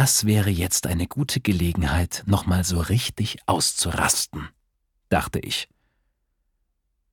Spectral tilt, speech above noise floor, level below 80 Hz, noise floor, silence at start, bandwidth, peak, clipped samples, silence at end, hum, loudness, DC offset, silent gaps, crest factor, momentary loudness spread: -4 dB/octave; 50 dB; -38 dBFS; -73 dBFS; 0 s; 19 kHz; -4 dBFS; under 0.1%; 1.5 s; none; -23 LUFS; under 0.1%; none; 20 dB; 7 LU